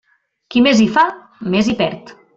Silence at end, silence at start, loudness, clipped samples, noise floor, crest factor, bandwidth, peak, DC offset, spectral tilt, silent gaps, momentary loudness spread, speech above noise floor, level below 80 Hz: 0.25 s; 0.5 s; -15 LUFS; under 0.1%; -44 dBFS; 14 dB; 7.8 kHz; -2 dBFS; under 0.1%; -5 dB/octave; none; 11 LU; 29 dB; -50 dBFS